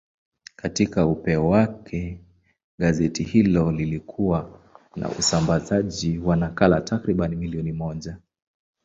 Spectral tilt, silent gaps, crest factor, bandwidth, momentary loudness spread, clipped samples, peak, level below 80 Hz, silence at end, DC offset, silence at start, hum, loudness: -6 dB/octave; 2.64-2.78 s; 20 dB; 7.8 kHz; 13 LU; under 0.1%; -2 dBFS; -42 dBFS; 0.7 s; under 0.1%; 0.65 s; none; -23 LUFS